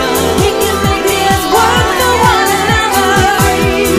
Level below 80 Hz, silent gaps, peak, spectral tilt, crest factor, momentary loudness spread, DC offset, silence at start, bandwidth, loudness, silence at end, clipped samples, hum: -26 dBFS; none; 0 dBFS; -3.5 dB/octave; 10 dB; 3 LU; under 0.1%; 0 s; 16 kHz; -10 LUFS; 0 s; under 0.1%; none